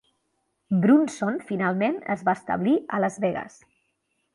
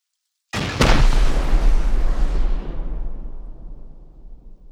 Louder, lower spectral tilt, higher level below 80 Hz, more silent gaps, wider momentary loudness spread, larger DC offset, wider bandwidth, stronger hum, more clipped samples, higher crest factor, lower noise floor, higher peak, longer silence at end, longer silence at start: about the same, -24 LUFS vs -23 LUFS; first, -7 dB/octave vs -5 dB/octave; second, -68 dBFS vs -18 dBFS; neither; second, 9 LU vs 22 LU; neither; about the same, 11.5 kHz vs 10.5 kHz; neither; neither; about the same, 16 dB vs 18 dB; about the same, -74 dBFS vs -77 dBFS; second, -8 dBFS vs 0 dBFS; first, 0.85 s vs 0 s; first, 0.7 s vs 0.55 s